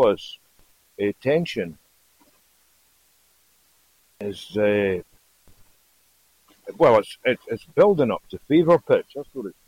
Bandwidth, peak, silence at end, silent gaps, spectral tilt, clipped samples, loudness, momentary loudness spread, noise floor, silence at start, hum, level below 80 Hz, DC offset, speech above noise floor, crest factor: 16 kHz; -6 dBFS; 0.15 s; none; -7 dB/octave; under 0.1%; -22 LUFS; 17 LU; -62 dBFS; 0 s; none; -58 dBFS; under 0.1%; 41 dB; 18 dB